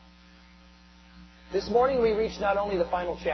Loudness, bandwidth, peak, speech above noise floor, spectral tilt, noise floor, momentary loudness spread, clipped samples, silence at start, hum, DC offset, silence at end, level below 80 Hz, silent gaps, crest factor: -27 LUFS; 6.2 kHz; -12 dBFS; 28 dB; -6 dB/octave; -54 dBFS; 7 LU; under 0.1%; 1.15 s; none; under 0.1%; 0 s; -50 dBFS; none; 16 dB